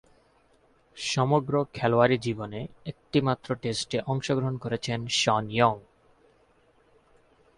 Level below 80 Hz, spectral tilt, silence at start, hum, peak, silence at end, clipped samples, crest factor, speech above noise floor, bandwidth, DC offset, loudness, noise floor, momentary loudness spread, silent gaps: -60 dBFS; -5 dB/octave; 0.95 s; none; -6 dBFS; 1.75 s; under 0.1%; 22 dB; 37 dB; 11.5 kHz; under 0.1%; -27 LUFS; -63 dBFS; 11 LU; none